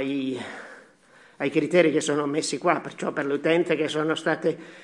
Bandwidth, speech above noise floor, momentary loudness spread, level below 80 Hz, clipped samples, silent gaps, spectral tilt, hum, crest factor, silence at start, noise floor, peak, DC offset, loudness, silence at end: 11.5 kHz; 31 dB; 11 LU; -78 dBFS; under 0.1%; none; -4.5 dB/octave; none; 20 dB; 0 s; -55 dBFS; -4 dBFS; under 0.1%; -25 LUFS; 0 s